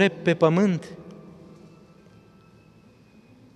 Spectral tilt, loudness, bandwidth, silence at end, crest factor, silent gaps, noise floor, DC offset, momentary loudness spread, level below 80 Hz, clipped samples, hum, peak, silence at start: -7 dB/octave; -22 LUFS; 9.6 kHz; 2.45 s; 24 dB; none; -54 dBFS; under 0.1%; 26 LU; -66 dBFS; under 0.1%; none; -4 dBFS; 0 s